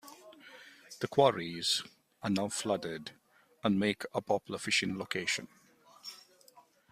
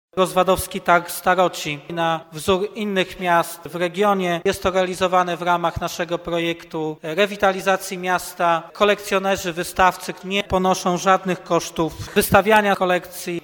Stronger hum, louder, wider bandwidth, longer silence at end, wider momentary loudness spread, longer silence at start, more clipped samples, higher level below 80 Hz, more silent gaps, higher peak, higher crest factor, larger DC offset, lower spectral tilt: neither; second, -33 LUFS vs -20 LUFS; second, 15.5 kHz vs 19.5 kHz; first, 0.3 s vs 0.05 s; first, 24 LU vs 7 LU; about the same, 0.05 s vs 0.15 s; neither; second, -72 dBFS vs -46 dBFS; neither; second, -12 dBFS vs 0 dBFS; about the same, 24 dB vs 20 dB; neither; about the same, -3.5 dB/octave vs -4 dB/octave